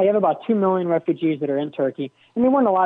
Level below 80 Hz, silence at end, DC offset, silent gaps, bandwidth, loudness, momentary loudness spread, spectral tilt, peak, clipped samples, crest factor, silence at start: -68 dBFS; 0 s; under 0.1%; none; 4 kHz; -21 LUFS; 7 LU; -10 dB/octave; -8 dBFS; under 0.1%; 12 dB; 0 s